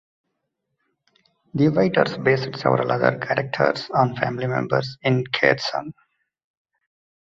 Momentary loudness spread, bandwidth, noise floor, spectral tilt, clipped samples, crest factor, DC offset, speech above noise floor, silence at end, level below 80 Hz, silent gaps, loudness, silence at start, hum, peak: 6 LU; 7.6 kHz; -77 dBFS; -7 dB/octave; under 0.1%; 22 dB; under 0.1%; 56 dB; 1.4 s; -60 dBFS; none; -21 LUFS; 1.55 s; none; -2 dBFS